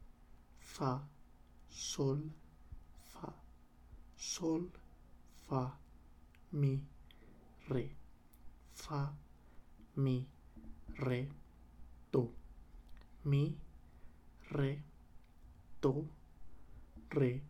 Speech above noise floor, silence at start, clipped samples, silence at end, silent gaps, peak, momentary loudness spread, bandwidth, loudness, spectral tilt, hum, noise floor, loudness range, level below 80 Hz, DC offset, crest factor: 24 dB; 0 s; under 0.1%; 0 s; none; -22 dBFS; 25 LU; 12.5 kHz; -40 LUFS; -6.5 dB/octave; 60 Hz at -70 dBFS; -61 dBFS; 4 LU; -60 dBFS; under 0.1%; 20 dB